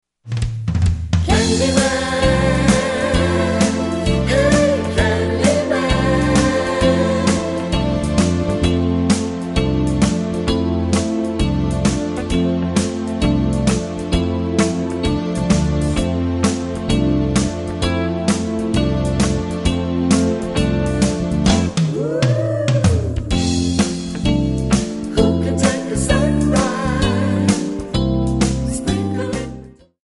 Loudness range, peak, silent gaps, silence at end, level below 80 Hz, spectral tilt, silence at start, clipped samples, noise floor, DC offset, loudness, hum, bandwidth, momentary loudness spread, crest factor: 3 LU; -2 dBFS; none; 0.35 s; -28 dBFS; -5.5 dB/octave; 0.25 s; under 0.1%; -37 dBFS; under 0.1%; -18 LUFS; none; 11.5 kHz; 5 LU; 16 dB